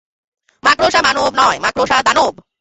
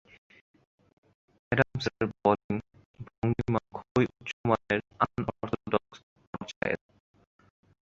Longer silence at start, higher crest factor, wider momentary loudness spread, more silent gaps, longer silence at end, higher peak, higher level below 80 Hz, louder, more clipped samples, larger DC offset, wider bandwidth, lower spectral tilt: second, 0.65 s vs 1.5 s; second, 14 dB vs 26 dB; second, 5 LU vs 9 LU; second, none vs 2.44-2.49 s, 2.85-2.94 s, 3.18-3.22 s, 3.91-3.95 s, 4.33-4.44 s, 6.03-6.16 s, 6.27-6.33 s, 6.56-6.61 s; second, 0.3 s vs 1.05 s; first, 0 dBFS vs -6 dBFS; first, -46 dBFS vs -56 dBFS; first, -13 LUFS vs -30 LUFS; neither; neither; about the same, 8.2 kHz vs 7.8 kHz; second, -2 dB/octave vs -7 dB/octave